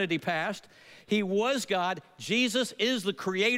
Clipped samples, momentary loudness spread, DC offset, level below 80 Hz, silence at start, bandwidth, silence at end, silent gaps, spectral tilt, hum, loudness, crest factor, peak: under 0.1%; 7 LU; under 0.1%; -78 dBFS; 0 s; 16 kHz; 0 s; none; -3.5 dB/octave; none; -29 LUFS; 16 dB; -12 dBFS